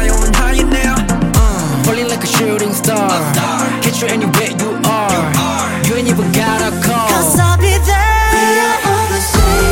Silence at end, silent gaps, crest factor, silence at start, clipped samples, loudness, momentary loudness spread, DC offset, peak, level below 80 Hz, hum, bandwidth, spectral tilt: 0 s; none; 12 dB; 0 s; under 0.1%; -13 LUFS; 4 LU; under 0.1%; 0 dBFS; -18 dBFS; none; 17 kHz; -4.5 dB/octave